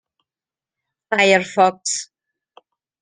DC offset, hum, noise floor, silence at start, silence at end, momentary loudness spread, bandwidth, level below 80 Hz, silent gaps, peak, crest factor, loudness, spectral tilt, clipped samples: under 0.1%; none; under -90 dBFS; 1.1 s; 0.95 s; 11 LU; 10 kHz; -68 dBFS; none; -2 dBFS; 20 dB; -17 LUFS; -2.5 dB/octave; under 0.1%